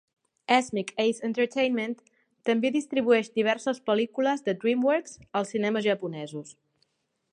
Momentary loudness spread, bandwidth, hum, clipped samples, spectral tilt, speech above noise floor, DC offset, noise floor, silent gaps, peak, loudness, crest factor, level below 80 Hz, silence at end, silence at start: 11 LU; 10.5 kHz; none; under 0.1%; -4.5 dB/octave; 47 dB; under 0.1%; -73 dBFS; none; -8 dBFS; -27 LUFS; 20 dB; -74 dBFS; 0.8 s; 0.5 s